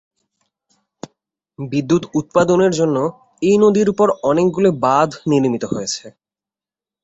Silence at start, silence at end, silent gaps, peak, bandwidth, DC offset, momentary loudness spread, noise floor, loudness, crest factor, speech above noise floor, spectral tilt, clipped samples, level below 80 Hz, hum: 1.6 s; 0.95 s; none; -2 dBFS; 8.2 kHz; under 0.1%; 9 LU; under -90 dBFS; -16 LUFS; 16 dB; over 74 dB; -6 dB/octave; under 0.1%; -56 dBFS; none